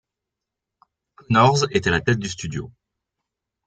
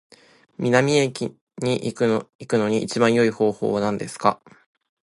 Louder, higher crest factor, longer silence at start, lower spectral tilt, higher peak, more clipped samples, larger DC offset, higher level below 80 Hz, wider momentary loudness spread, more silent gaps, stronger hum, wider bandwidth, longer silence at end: about the same, -20 LUFS vs -22 LUFS; about the same, 20 dB vs 22 dB; first, 1.3 s vs 0.6 s; about the same, -5 dB/octave vs -5.5 dB/octave; second, -4 dBFS vs 0 dBFS; neither; neither; first, -52 dBFS vs -62 dBFS; first, 15 LU vs 10 LU; second, none vs 1.41-1.47 s, 2.35-2.39 s; neither; second, 9.2 kHz vs 11.5 kHz; first, 0.95 s vs 0.7 s